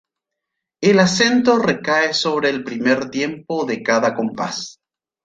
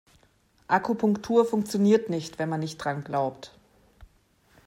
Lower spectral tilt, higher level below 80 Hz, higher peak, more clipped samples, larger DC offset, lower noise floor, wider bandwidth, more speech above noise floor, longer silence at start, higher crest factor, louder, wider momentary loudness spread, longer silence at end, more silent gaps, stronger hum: second, -4 dB/octave vs -6.5 dB/octave; about the same, -60 dBFS vs -62 dBFS; first, -2 dBFS vs -10 dBFS; neither; neither; first, -81 dBFS vs -63 dBFS; second, 9.2 kHz vs 14 kHz; first, 64 dB vs 38 dB; about the same, 0.8 s vs 0.7 s; about the same, 18 dB vs 18 dB; first, -18 LUFS vs -26 LUFS; about the same, 10 LU vs 10 LU; about the same, 0.55 s vs 0.6 s; neither; neither